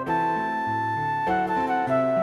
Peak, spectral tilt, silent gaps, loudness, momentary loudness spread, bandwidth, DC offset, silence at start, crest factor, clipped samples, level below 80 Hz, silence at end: -12 dBFS; -7 dB/octave; none; -25 LUFS; 3 LU; 12.5 kHz; under 0.1%; 0 s; 12 dB; under 0.1%; -56 dBFS; 0 s